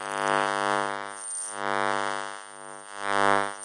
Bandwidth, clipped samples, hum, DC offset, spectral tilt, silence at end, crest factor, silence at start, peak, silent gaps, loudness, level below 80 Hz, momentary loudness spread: 11.5 kHz; under 0.1%; none; under 0.1%; -2.5 dB/octave; 0 s; 22 dB; 0 s; -6 dBFS; none; -27 LUFS; -66 dBFS; 16 LU